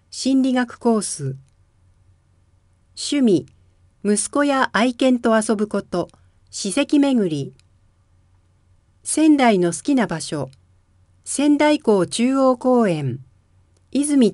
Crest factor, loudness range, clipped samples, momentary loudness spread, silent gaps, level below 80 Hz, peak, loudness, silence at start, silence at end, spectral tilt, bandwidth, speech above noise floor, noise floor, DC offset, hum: 18 dB; 5 LU; under 0.1%; 13 LU; none; -60 dBFS; -2 dBFS; -19 LUFS; 0.15 s; 0 s; -4.5 dB/octave; 11.5 kHz; 40 dB; -58 dBFS; under 0.1%; none